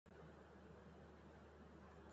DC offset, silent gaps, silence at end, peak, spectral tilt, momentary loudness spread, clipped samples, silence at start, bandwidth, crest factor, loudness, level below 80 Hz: under 0.1%; none; 0 s; -48 dBFS; -6 dB/octave; 1 LU; under 0.1%; 0.05 s; 8 kHz; 14 dB; -63 LUFS; -72 dBFS